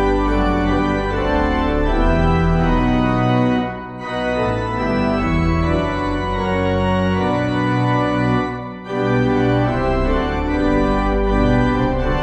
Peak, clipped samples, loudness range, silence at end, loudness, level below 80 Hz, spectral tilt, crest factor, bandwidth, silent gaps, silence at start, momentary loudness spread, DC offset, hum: -4 dBFS; under 0.1%; 2 LU; 0 s; -18 LUFS; -26 dBFS; -8 dB/octave; 14 dB; 8.4 kHz; none; 0 s; 4 LU; under 0.1%; none